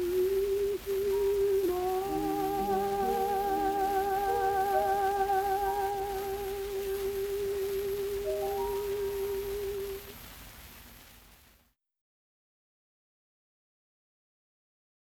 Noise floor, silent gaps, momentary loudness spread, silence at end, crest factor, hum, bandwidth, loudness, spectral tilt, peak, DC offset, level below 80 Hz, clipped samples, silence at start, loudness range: -68 dBFS; none; 10 LU; 3.8 s; 16 dB; none; over 20 kHz; -31 LUFS; -4.5 dB/octave; -16 dBFS; under 0.1%; -52 dBFS; under 0.1%; 0 s; 11 LU